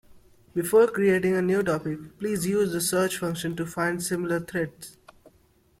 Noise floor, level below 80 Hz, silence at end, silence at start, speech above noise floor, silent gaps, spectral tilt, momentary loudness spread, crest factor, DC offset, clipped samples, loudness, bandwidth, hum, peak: -62 dBFS; -60 dBFS; 0.9 s; 0.15 s; 37 dB; none; -5 dB/octave; 12 LU; 18 dB; under 0.1%; under 0.1%; -25 LUFS; 16.5 kHz; none; -8 dBFS